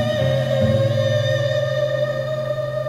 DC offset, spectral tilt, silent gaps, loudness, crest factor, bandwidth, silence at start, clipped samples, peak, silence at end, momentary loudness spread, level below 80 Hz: under 0.1%; -6.5 dB/octave; none; -20 LUFS; 14 dB; 14.5 kHz; 0 s; under 0.1%; -6 dBFS; 0 s; 6 LU; -48 dBFS